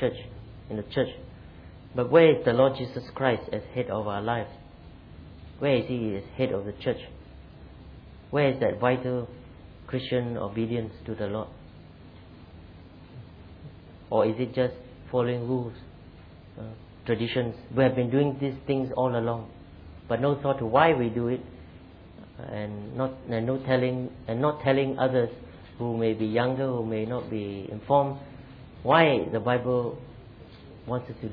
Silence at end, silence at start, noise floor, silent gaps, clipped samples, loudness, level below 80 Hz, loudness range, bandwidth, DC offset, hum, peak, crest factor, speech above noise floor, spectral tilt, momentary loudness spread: 0 s; 0 s; -48 dBFS; none; under 0.1%; -27 LUFS; -54 dBFS; 7 LU; 5.2 kHz; under 0.1%; none; -6 dBFS; 22 dB; 22 dB; -10 dB/octave; 25 LU